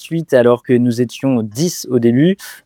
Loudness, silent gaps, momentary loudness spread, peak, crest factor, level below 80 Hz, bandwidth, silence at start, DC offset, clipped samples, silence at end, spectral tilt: -15 LUFS; none; 5 LU; 0 dBFS; 14 dB; -62 dBFS; 18.5 kHz; 0 s; under 0.1%; under 0.1%; 0.1 s; -6 dB/octave